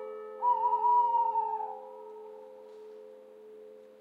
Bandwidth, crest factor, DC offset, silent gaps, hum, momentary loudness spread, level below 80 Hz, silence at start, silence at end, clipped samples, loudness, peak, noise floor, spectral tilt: 4 kHz; 14 dB; under 0.1%; none; none; 25 LU; under -90 dBFS; 0 s; 0.1 s; under 0.1%; -29 LUFS; -18 dBFS; -51 dBFS; -4.5 dB/octave